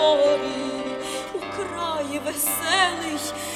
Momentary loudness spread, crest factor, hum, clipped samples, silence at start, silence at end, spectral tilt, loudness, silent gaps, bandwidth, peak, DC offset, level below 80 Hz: 10 LU; 18 dB; none; under 0.1%; 0 s; 0 s; -2 dB/octave; -24 LUFS; none; 16.5 kHz; -6 dBFS; under 0.1%; -58 dBFS